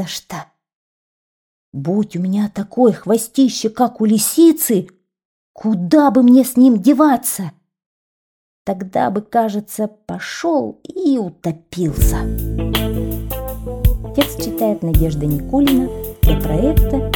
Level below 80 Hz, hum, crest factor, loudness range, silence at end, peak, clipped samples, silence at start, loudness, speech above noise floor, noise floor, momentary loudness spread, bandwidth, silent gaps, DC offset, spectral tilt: -26 dBFS; none; 14 dB; 7 LU; 0 s; -2 dBFS; under 0.1%; 0 s; -16 LUFS; over 75 dB; under -90 dBFS; 14 LU; over 20 kHz; 0.75-1.72 s, 5.25-5.54 s, 7.86-8.65 s; under 0.1%; -6 dB/octave